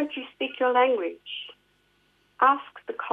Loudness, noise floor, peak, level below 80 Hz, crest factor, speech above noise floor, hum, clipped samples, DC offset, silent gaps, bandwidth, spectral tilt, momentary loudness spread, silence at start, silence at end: -25 LUFS; -66 dBFS; -6 dBFS; -78 dBFS; 20 dB; 42 dB; 50 Hz at -75 dBFS; under 0.1%; under 0.1%; none; 3.9 kHz; -4.5 dB/octave; 15 LU; 0 s; 0 s